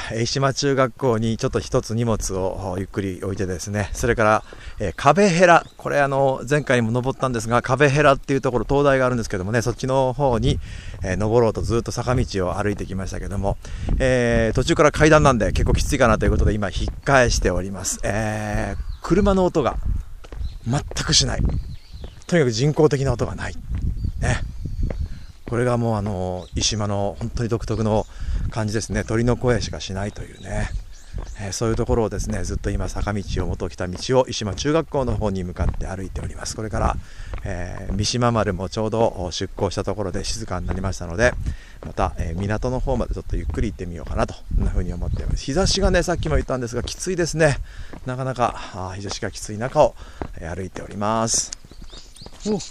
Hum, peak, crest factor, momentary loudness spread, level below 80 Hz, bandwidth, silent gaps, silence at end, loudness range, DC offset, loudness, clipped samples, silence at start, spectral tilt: none; 0 dBFS; 22 dB; 14 LU; -30 dBFS; 14 kHz; none; 0 s; 7 LU; under 0.1%; -22 LUFS; under 0.1%; 0 s; -5 dB/octave